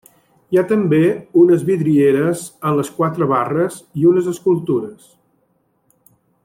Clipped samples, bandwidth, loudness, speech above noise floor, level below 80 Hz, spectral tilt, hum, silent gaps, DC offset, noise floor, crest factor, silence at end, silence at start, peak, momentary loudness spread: under 0.1%; 15.5 kHz; -16 LUFS; 47 dB; -60 dBFS; -7.5 dB/octave; none; none; under 0.1%; -63 dBFS; 14 dB; 1.5 s; 0.5 s; -2 dBFS; 8 LU